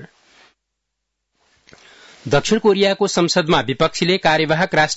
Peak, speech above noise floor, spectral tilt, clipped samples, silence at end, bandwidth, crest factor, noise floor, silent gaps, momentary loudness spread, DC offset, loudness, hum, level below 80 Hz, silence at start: -4 dBFS; 61 dB; -4 dB/octave; under 0.1%; 0 s; 8 kHz; 16 dB; -77 dBFS; none; 4 LU; under 0.1%; -16 LUFS; none; -48 dBFS; 0 s